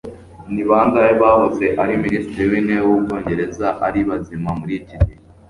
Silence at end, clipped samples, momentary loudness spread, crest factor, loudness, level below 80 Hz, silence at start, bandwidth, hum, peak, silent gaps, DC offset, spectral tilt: 0.4 s; under 0.1%; 11 LU; 16 dB; -17 LUFS; -32 dBFS; 0.05 s; 11 kHz; none; -2 dBFS; none; under 0.1%; -8.5 dB/octave